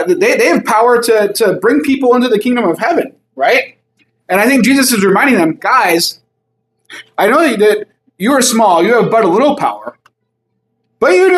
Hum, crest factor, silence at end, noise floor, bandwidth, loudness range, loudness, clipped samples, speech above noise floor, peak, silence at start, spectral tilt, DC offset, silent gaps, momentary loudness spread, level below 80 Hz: none; 12 dB; 0 s; -67 dBFS; 15 kHz; 2 LU; -11 LUFS; under 0.1%; 57 dB; 0 dBFS; 0 s; -4 dB/octave; under 0.1%; none; 8 LU; -60 dBFS